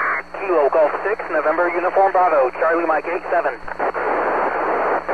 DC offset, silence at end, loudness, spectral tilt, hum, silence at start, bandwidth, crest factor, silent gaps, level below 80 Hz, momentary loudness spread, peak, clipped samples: 0.7%; 0 s; -19 LUFS; -6 dB/octave; none; 0 s; 9.4 kHz; 14 dB; none; -52 dBFS; 6 LU; -6 dBFS; under 0.1%